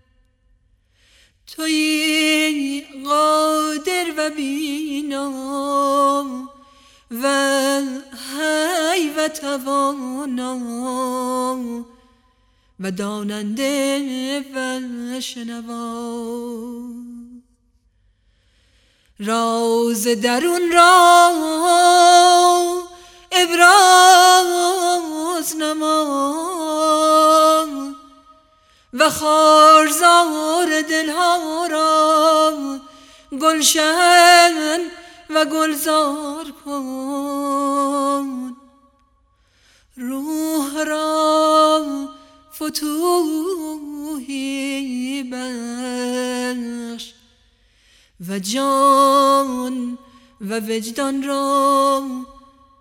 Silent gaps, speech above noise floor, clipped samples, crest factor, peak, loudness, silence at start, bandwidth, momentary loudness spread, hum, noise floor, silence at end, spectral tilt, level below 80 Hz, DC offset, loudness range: none; 44 dB; under 0.1%; 18 dB; 0 dBFS; -16 LUFS; 1.5 s; 17.5 kHz; 18 LU; none; -60 dBFS; 0.5 s; -2 dB/octave; -60 dBFS; under 0.1%; 13 LU